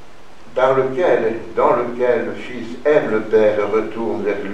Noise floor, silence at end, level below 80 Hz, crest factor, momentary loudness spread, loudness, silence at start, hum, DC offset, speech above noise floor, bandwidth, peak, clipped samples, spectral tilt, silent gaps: -44 dBFS; 0 s; -52 dBFS; 18 dB; 8 LU; -18 LUFS; 0.45 s; none; 3%; 26 dB; 8.8 kHz; 0 dBFS; under 0.1%; -6.5 dB/octave; none